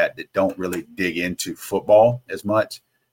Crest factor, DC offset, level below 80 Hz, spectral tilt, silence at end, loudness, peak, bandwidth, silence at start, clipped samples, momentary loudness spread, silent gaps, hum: 18 dB; under 0.1%; -58 dBFS; -5 dB/octave; 0.35 s; -21 LUFS; -4 dBFS; 17 kHz; 0 s; under 0.1%; 13 LU; none; none